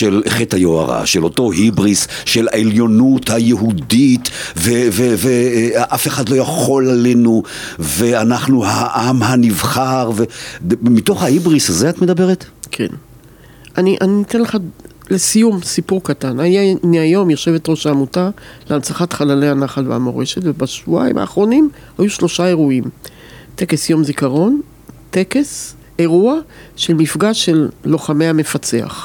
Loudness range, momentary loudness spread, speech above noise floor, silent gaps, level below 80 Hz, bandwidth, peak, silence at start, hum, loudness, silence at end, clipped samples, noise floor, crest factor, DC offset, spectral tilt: 3 LU; 9 LU; 27 dB; none; -46 dBFS; 19 kHz; -2 dBFS; 0 s; none; -14 LUFS; 0 s; under 0.1%; -41 dBFS; 12 dB; under 0.1%; -5 dB/octave